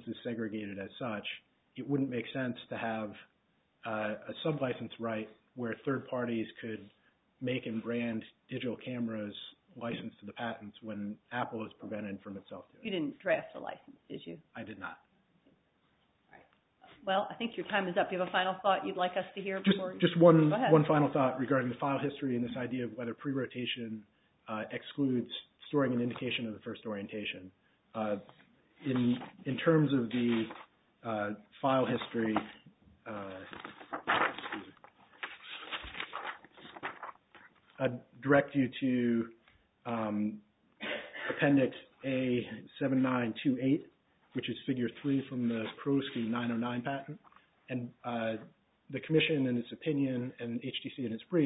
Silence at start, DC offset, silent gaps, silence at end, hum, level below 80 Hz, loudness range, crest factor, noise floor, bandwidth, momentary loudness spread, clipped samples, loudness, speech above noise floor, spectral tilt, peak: 0 s; under 0.1%; none; 0 s; none; -72 dBFS; 12 LU; 26 dB; -74 dBFS; 3.9 kHz; 16 LU; under 0.1%; -34 LUFS; 40 dB; -4 dB/octave; -10 dBFS